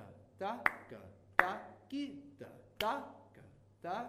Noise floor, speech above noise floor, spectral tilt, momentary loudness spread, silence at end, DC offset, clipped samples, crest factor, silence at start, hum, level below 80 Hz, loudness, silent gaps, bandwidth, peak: -61 dBFS; 20 dB; -4 dB/octave; 22 LU; 0 s; under 0.1%; under 0.1%; 34 dB; 0 s; none; -72 dBFS; -38 LUFS; none; 15.5 kHz; -6 dBFS